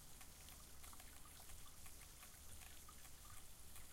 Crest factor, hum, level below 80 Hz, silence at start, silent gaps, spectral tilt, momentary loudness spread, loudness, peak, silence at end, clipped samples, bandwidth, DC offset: 18 dB; none; -64 dBFS; 0 s; none; -2 dB/octave; 1 LU; -59 LUFS; -40 dBFS; 0 s; under 0.1%; 16 kHz; under 0.1%